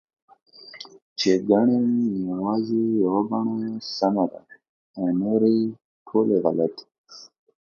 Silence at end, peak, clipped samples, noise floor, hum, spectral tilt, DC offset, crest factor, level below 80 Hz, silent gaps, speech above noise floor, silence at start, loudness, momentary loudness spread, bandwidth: 0.55 s; -4 dBFS; under 0.1%; -44 dBFS; none; -6.5 dB/octave; under 0.1%; 20 dB; -68 dBFS; 1.02-1.16 s, 4.69-4.94 s, 5.84-6.06 s, 6.98-7.04 s; 22 dB; 0.65 s; -23 LUFS; 22 LU; 7.2 kHz